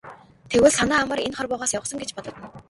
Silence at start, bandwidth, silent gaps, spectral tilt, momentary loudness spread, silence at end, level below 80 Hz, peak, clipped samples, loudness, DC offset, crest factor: 0.05 s; 11.5 kHz; none; -3 dB/octave; 16 LU; 0.1 s; -50 dBFS; -4 dBFS; under 0.1%; -22 LUFS; under 0.1%; 20 dB